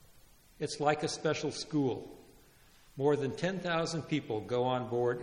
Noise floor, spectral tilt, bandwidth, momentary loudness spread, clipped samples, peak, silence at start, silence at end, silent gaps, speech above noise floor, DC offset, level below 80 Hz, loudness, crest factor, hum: -61 dBFS; -5 dB/octave; 16 kHz; 8 LU; under 0.1%; -14 dBFS; 0.15 s; 0 s; none; 28 dB; under 0.1%; -66 dBFS; -33 LUFS; 20 dB; none